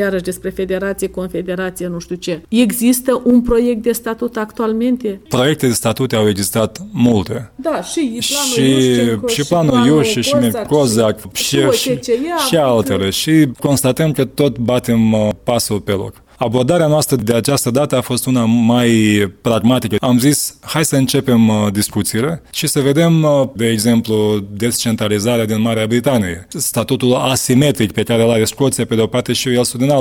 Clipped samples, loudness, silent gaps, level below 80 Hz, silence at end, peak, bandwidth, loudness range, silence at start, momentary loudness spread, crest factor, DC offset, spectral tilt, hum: under 0.1%; -15 LUFS; none; -42 dBFS; 0 s; 0 dBFS; 18 kHz; 2 LU; 0 s; 8 LU; 14 dB; under 0.1%; -5 dB/octave; none